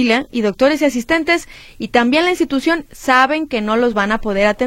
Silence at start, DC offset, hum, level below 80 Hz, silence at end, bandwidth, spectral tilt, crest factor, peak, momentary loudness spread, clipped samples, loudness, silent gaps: 0 s; under 0.1%; none; -40 dBFS; 0 s; 16.5 kHz; -4 dB/octave; 16 dB; 0 dBFS; 6 LU; under 0.1%; -16 LUFS; none